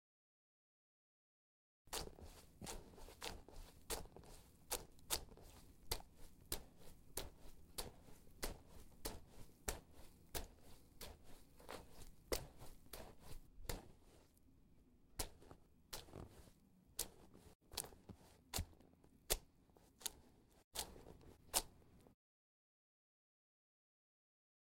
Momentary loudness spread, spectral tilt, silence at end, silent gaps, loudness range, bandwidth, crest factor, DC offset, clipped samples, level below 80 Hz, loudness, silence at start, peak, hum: 21 LU; -2 dB/octave; 2.55 s; 17.55-17.60 s, 20.64-20.71 s; 6 LU; 16.5 kHz; 36 dB; under 0.1%; under 0.1%; -60 dBFS; -50 LUFS; 1.85 s; -16 dBFS; none